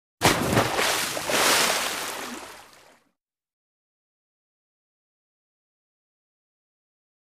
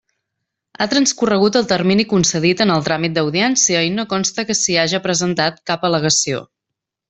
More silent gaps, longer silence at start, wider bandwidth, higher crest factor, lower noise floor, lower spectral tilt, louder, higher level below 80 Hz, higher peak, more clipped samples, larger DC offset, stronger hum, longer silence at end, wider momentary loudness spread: neither; second, 0.2 s vs 0.8 s; first, 15.5 kHz vs 8.4 kHz; first, 22 dB vs 16 dB; second, -75 dBFS vs -82 dBFS; about the same, -2.5 dB/octave vs -3.5 dB/octave; second, -22 LUFS vs -16 LUFS; about the same, -54 dBFS vs -54 dBFS; second, -6 dBFS vs -2 dBFS; neither; neither; neither; first, 4.75 s vs 0.65 s; first, 16 LU vs 5 LU